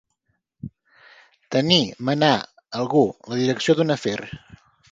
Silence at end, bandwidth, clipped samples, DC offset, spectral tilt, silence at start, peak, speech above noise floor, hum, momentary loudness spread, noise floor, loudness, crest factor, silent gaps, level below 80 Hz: 0.55 s; 9.2 kHz; under 0.1%; under 0.1%; -5 dB/octave; 0.65 s; 0 dBFS; 52 dB; none; 22 LU; -73 dBFS; -21 LUFS; 24 dB; none; -60 dBFS